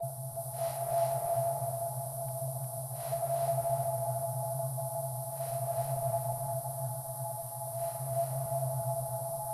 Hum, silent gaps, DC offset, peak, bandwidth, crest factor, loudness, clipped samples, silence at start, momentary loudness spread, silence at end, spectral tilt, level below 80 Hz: none; none; under 0.1%; -20 dBFS; 14.5 kHz; 14 dB; -35 LUFS; under 0.1%; 0 s; 6 LU; 0 s; -5.5 dB/octave; -64 dBFS